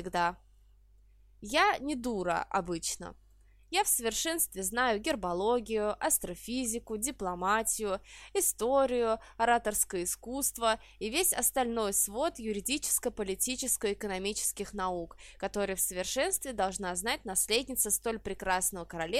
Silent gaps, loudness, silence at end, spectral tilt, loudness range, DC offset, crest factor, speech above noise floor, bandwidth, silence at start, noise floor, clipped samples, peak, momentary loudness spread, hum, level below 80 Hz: none; -31 LUFS; 0 s; -2 dB/octave; 3 LU; under 0.1%; 20 dB; 29 dB; 16 kHz; 0 s; -60 dBFS; under 0.1%; -12 dBFS; 8 LU; none; -54 dBFS